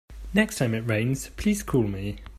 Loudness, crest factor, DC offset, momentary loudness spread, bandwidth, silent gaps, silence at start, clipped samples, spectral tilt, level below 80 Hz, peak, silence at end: -26 LUFS; 20 dB; under 0.1%; 5 LU; 15 kHz; none; 0.1 s; under 0.1%; -5.5 dB/octave; -42 dBFS; -6 dBFS; 0 s